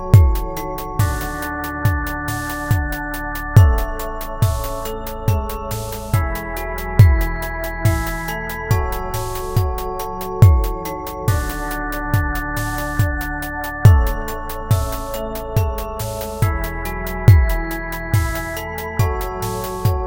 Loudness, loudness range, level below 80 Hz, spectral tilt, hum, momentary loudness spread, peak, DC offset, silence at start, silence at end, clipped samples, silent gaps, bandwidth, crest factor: -20 LUFS; 2 LU; -24 dBFS; -6 dB/octave; none; 12 LU; 0 dBFS; under 0.1%; 0 s; 0 s; under 0.1%; none; 17.5 kHz; 18 dB